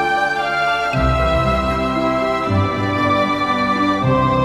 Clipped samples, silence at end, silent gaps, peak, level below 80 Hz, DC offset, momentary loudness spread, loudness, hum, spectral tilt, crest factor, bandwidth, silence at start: under 0.1%; 0 s; none; -4 dBFS; -30 dBFS; under 0.1%; 2 LU; -17 LUFS; none; -6.5 dB/octave; 14 dB; 13.5 kHz; 0 s